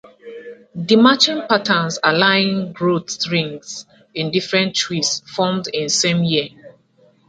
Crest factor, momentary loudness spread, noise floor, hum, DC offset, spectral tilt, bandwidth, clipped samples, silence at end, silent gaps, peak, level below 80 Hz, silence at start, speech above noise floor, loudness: 18 dB; 19 LU; -55 dBFS; none; under 0.1%; -3.5 dB/octave; 9.4 kHz; under 0.1%; 0.6 s; none; 0 dBFS; -62 dBFS; 0.05 s; 37 dB; -17 LUFS